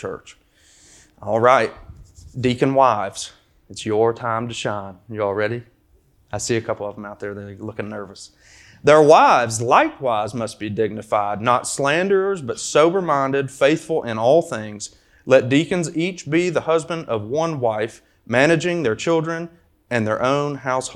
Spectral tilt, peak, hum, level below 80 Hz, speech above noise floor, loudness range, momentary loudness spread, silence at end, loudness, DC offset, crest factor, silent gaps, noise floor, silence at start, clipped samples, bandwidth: -5 dB/octave; 0 dBFS; none; -56 dBFS; 38 dB; 8 LU; 16 LU; 0 s; -19 LUFS; under 0.1%; 20 dB; none; -57 dBFS; 0 s; under 0.1%; 13 kHz